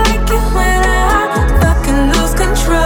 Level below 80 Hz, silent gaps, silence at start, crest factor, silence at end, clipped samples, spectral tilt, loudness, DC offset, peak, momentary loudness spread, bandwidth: -14 dBFS; none; 0 s; 10 dB; 0 s; under 0.1%; -5 dB/octave; -13 LUFS; under 0.1%; -2 dBFS; 2 LU; 17.5 kHz